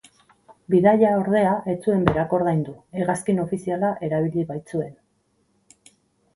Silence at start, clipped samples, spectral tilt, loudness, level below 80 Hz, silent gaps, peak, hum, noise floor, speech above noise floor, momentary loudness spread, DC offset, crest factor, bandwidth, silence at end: 0.7 s; under 0.1%; -7.5 dB/octave; -22 LUFS; -52 dBFS; none; -2 dBFS; none; -67 dBFS; 46 dB; 11 LU; under 0.1%; 22 dB; 11.5 kHz; 1.45 s